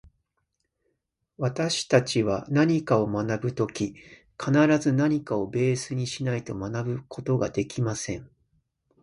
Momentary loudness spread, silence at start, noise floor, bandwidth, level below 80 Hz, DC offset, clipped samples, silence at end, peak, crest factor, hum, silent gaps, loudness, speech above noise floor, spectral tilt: 10 LU; 1.4 s; -78 dBFS; 11.5 kHz; -58 dBFS; under 0.1%; under 0.1%; 0.75 s; -6 dBFS; 20 dB; none; none; -26 LUFS; 52 dB; -6 dB/octave